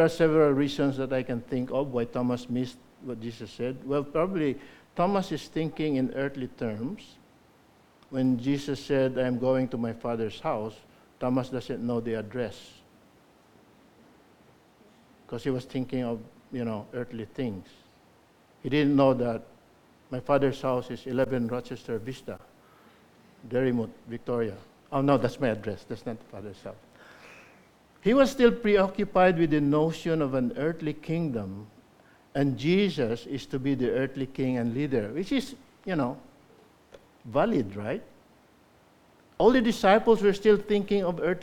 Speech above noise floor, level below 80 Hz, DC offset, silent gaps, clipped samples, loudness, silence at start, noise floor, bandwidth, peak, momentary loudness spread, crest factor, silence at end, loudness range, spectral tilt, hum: 33 dB; -54 dBFS; under 0.1%; none; under 0.1%; -28 LUFS; 0 s; -60 dBFS; 15 kHz; -6 dBFS; 16 LU; 22 dB; 0 s; 10 LU; -7 dB/octave; none